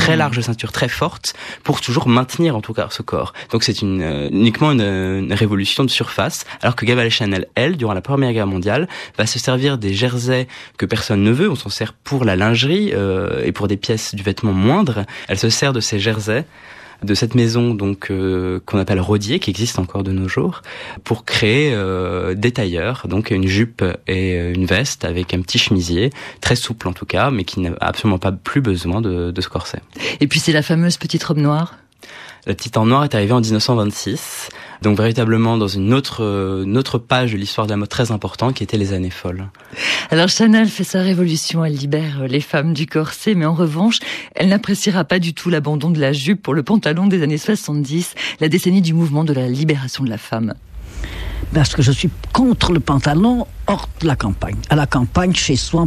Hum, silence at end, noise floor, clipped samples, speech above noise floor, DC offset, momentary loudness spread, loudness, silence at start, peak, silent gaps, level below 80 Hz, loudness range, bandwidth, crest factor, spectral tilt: none; 0 s; -38 dBFS; under 0.1%; 22 dB; under 0.1%; 8 LU; -17 LUFS; 0 s; -2 dBFS; none; -38 dBFS; 2 LU; 14.5 kHz; 16 dB; -5.5 dB/octave